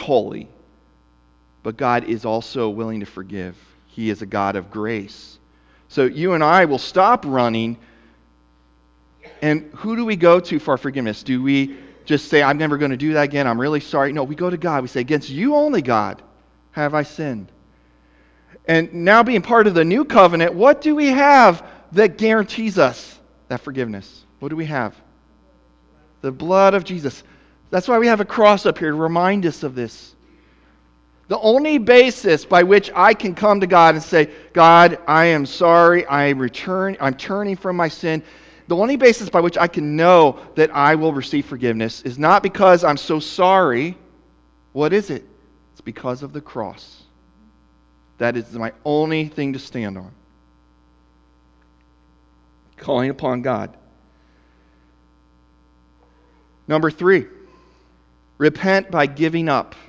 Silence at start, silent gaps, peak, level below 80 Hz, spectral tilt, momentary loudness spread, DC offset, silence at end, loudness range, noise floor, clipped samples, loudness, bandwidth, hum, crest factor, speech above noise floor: 0 s; none; 0 dBFS; -54 dBFS; -6 dB/octave; 17 LU; under 0.1%; 0.25 s; 13 LU; -55 dBFS; under 0.1%; -17 LUFS; 8 kHz; none; 18 dB; 39 dB